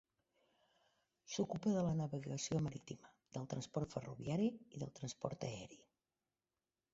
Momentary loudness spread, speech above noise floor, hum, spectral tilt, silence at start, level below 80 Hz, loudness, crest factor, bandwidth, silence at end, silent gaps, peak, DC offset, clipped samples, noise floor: 14 LU; over 48 dB; none; -7 dB/octave; 1.3 s; -70 dBFS; -43 LUFS; 22 dB; 8 kHz; 1.1 s; none; -22 dBFS; under 0.1%; under 0.1%; under -90 dBFS